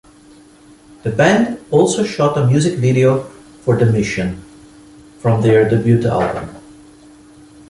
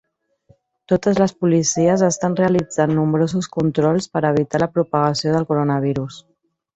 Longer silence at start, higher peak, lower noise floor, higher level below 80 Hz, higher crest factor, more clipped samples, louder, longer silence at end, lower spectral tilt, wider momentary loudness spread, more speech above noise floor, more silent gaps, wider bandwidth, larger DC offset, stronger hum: first, 1.05 s vs 0.9 s; about the same, -2 dBFS vs -2 dBFS; second, -44 dBFS vs -57 dBFS; first, -44 dBFS vs -54 dBFS; about the same, 16 dB vs 16 dB; neither; first, -15 LUFS vs -18 LUFS; first, 1.1 s vs 0.55 s; about the same, -6.5 dB/octave vs -6 dB/octave; first, 12 LU vs 4 LU; second, 30 dB vs 39 dB; neither; first, 11.5 kHz vs 8.2 kHz; neither; neither